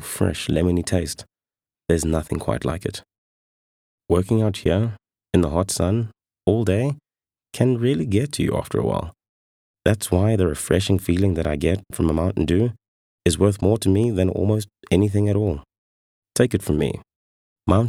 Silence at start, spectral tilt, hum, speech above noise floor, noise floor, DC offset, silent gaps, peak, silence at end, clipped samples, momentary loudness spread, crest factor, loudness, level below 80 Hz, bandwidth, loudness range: 0 s; -6.5 dB/octave; none; over 70 dB; under -90 dBFS; under 0.1%; 3.18-3.98 s, 9.29-9.74 s, 12.88-13.18 s, 15.78-16.22 s, 17.16-17.56 s; -2 dBFS; 0 s; under 0.1%; 9 LU; 20 dB; -22 LUFS; -38 dBFS; 15.5 kHz; 4 LU